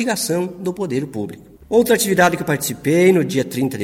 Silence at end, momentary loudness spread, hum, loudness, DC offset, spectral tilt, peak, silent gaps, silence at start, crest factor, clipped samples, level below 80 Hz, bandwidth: 0 s; 11 LU; none; -18 LUFS; under 0.1%; -4.5 dB/octave; 0 dBFS; none; 0 s; 16 dB; under 0.1%; -52 dBFS; 17 kHz